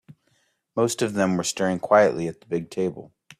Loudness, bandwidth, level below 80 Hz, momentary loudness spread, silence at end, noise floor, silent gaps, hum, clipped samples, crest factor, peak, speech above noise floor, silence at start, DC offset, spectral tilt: -23 LUFS; 14.5 kHz; -64 dBFS; 12 LU; 0.35 s; -68 dBFS; none; none; under 0.1%; 18 dB; -6 dBFS; 45 dB; 0.1 s; under 0.1%; -5 dB/octave